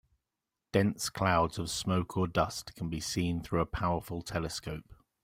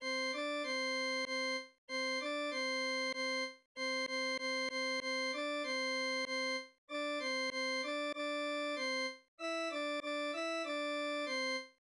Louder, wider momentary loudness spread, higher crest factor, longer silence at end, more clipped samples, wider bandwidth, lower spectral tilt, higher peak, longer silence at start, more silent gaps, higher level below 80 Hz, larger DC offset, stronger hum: first, -32 LUFS vs -37 LUFS; first, 9 LU vs 4 LU; first, 22 dB vs 8 dB; first, 0.3 s vs 0.15 s; neither; first, 16.5 kHz vs 11 kHz; first, -5 dB/octave vs 0 dB/octave; first, -12 dBFS vs -30 dBFS; first, 0.75 s vs 0 s; second, none vs 1.78-1.88 s, 3.65-3.75 s, 6.78-6.88 s, 9.28-9.38 s; first, -52 dBFS vs -88 dBFS; neither; neither